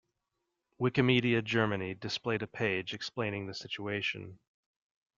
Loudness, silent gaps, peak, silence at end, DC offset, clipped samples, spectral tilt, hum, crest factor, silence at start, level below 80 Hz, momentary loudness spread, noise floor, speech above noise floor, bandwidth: -32 LUFS; none; -12 dBFS; 0.8 s; under 0.1%; under 0.1%; -6 dB/octave; none; 22 dB; 0.8 s; -68 dBFS; 12 LU; -85 dBFS; 52 dB; 7.6 kHz